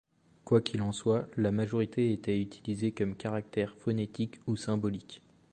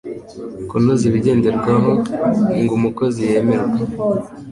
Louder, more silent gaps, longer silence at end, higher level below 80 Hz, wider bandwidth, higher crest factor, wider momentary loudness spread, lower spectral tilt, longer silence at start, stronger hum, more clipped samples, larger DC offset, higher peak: second, -32 LUFS vs -17 LUFS; neither; first, 0.35 s vs 0 s; second, -60 dBFS vs -46 dBFS; second, 9.6 kHz vs 11.5 kHz; first, 20 dB vs 14 dB; about the same, 7 LU vs 9 LU; about the same, -7 dB/octave vs -8 dB/octave; first, 0.45 s vs 0.05 s; neither; neither; neither; second, -12 dBFS vs -2 dBFS